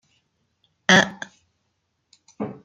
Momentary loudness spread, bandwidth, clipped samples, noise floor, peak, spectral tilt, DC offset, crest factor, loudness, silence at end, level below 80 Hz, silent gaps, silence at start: 23 LU; 9.2 kHz; under 0.1%; -74 dBFS; -2 dBFS; -3 dB/octave; under 0.1%; 24 dB; -18 LUFS; 0.1 s; -66 dBFS; none; 0.9 s